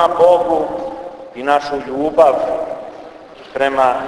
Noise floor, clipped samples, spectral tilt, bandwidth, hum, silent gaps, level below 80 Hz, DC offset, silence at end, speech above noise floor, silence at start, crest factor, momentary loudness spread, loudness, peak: -36 dBFS; under 0.1%; -5 dB/octave; 11 kHz; none; none; -50 dBFS; under 0.1%; 0 s; 22 dB; 0 s; 16 dB; 19 LU; -15 LUFS; 0 dBFS